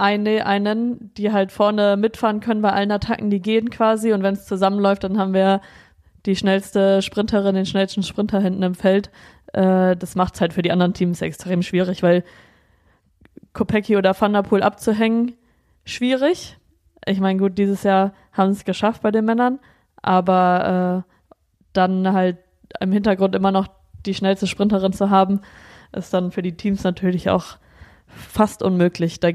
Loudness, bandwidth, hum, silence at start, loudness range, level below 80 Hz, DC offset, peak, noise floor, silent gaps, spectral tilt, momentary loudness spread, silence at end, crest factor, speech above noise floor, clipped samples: -19 LUFS; 13.5 kHz; none; 0 s; 2 LU; -50 dBFS; under 0.1%; -4 dBFS; -59 dBFS; none; -6.5 dB/octave; 8 LU; 0 s; 16 dB; 41 dB; under 0.1%